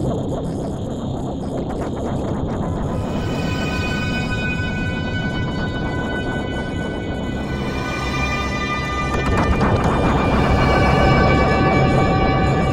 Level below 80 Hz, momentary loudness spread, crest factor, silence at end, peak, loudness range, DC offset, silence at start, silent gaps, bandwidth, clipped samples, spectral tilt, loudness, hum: -28 dBFS; 9 LU; 16 dB; 0 s; -2 dBFS; 7 LU; under 0.1%; 0 s; none; 12.5 kHz; under 0.1%; -6.5 dB/octave; -20 LUFS; none